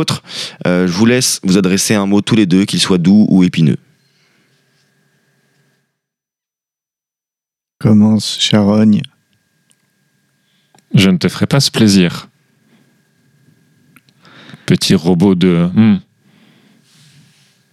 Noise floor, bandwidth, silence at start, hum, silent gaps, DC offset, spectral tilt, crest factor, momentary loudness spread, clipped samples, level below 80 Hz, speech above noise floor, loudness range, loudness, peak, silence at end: -87 dBFS; 14 kHz; 0 s; none; none; under 0.1%; -5 dB/octave; 14 dB; 8 LU; under 0.1%; -52 dBFS; 76 dB; 6 LU; -12 LUFS; 0 dBFS; 1.7 s